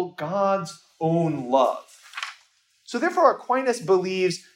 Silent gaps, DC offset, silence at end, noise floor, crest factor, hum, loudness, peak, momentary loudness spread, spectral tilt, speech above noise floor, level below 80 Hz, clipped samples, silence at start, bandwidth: none; under 0.1%; 0.15 s; -62 dBFS; 20 dB; none; -23 LUFS; -4 dBFS; 15 LU; -5.5 dB/octave; 39 dB; -76 dBFS; under 0.1%; 0 s; 15.5 kHz